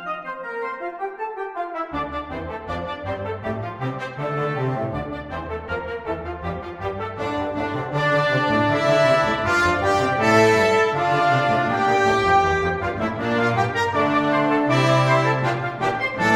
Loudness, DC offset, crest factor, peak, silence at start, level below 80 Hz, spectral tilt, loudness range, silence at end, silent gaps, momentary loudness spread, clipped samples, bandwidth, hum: -21 LUFS; under 0.1%; 18 dB; -4 dBFS; 0 s; -46 dBFS; -5.5 dB/octave; 10 LU; 0 s; none; 12 LU; under 0.1%; 13.5 kHz; none